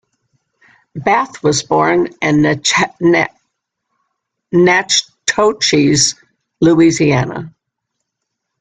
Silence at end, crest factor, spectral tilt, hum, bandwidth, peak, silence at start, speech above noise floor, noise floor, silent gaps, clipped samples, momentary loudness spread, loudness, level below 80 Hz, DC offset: 1.1 s; 14 dB; -4 dB/octave; none; 9.4 kHz; 0 dBFS; 0.95 s; 63 dB; -76 dBFS; none; under 0.1%; 8 LU; -13 LUFS; -50 dBFS; under 0.1%